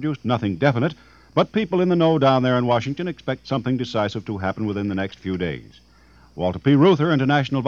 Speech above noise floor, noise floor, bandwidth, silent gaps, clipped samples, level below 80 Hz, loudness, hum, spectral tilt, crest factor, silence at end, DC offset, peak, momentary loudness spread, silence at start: 31 dB; -52 dBFS; 7.2 kHz; none; under 0.1%; -52 dBFS; -21 LUFS; none; -7.5 dB/octave; 18 dB; 0 s; under 0.1%; -2 dBFS; 11 LU; 0 s